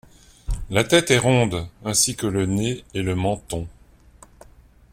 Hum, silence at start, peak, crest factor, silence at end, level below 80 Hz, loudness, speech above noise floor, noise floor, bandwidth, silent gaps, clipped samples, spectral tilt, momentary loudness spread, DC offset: none; 0.5 s; -2 dBFS; 22 dB; 1.2 s; -38 dBFS; -21 LUFS; 29 dB; -50 dBFS; 16.5 kHz; none; under 0.1%; -4 dB/octave; 15 LU; under 0.1%